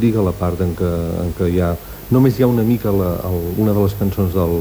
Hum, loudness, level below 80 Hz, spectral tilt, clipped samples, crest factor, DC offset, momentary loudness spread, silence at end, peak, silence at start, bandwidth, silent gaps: none; -18 LUFS; -34 dBFS; -8.5 dB/octave; under 0.1%; 14 dB; under 0.1%; 6 LU; 0 s; -2 dBFS; 0 s; over 20 kHz; none